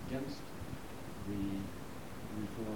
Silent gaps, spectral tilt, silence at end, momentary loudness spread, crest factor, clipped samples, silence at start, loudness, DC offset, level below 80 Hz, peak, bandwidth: none; -6 dB/octave; 0 s; 8 LU; 14 dB; under 0.1%; 0 s; -44 LUFS; 0.4%; -56 dBFS; -26 dBFS; 19 kHz